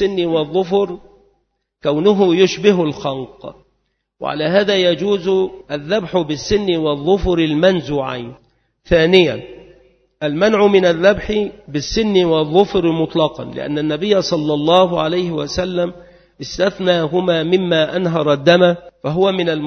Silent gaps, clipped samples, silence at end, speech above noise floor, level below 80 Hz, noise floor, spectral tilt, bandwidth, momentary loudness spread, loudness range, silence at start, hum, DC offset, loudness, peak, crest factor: none; under 0.1%; 0 s; 52 dB; -40 dBFS; -67 dBFS; -6 dB/octave; 6.6 kHz; 12 LU; 3 LU; 0 s; none; under 0.1%; -16 LUFS; 0 dBFS; 16 dB